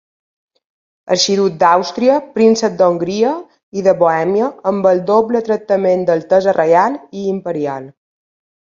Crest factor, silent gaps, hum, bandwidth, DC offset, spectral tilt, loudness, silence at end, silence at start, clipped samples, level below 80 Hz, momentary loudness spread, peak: 14 dB; 3.63-3.72 s; none; 7.6 kHz; under 0.1%; -5 dB/octave; -14 LUFS; 0.75 s; 1.05 s; under 0.1%; -60 dBFS; 9 LU; 0 dBFS